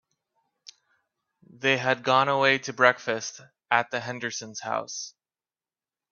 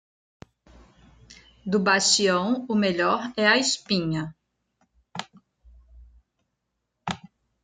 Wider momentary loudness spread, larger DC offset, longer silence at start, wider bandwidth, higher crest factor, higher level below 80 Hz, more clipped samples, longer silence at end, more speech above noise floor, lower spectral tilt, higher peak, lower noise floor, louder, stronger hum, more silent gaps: second, 13 LU vs 19 LU; neither; first, 1.6 s vs 1.3 s; second, 7.4 kHz vs 9.6 kHz; about the same, 26 dB vs 22 dB; second, -74 dBFS vs -58 dBFS; neither; first, 1.05 s vs 0.5 s; first, over 64 dB vs 57 dB; about the same, -3 dB/octave vs -3 dB/octave; about the same, -2 dBFS vs -4 dBFS; first, under -90 dBFS vs -79 dBFS; about the same, -25 LUFS vs -23 LUFS; neither; neither